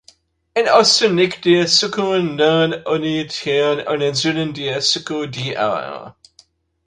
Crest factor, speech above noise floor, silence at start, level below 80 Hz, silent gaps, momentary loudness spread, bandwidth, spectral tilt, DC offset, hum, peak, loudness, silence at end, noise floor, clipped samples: 18 dB; 37 dB; 0.55 s; -58 dBFS; none; 11 LU; 11 kHz; -3.5 dB/octave; under 0.1%; none; 0 dBFS; -17 LUFS; 0.75 s; -54 dBFS; under 0.1%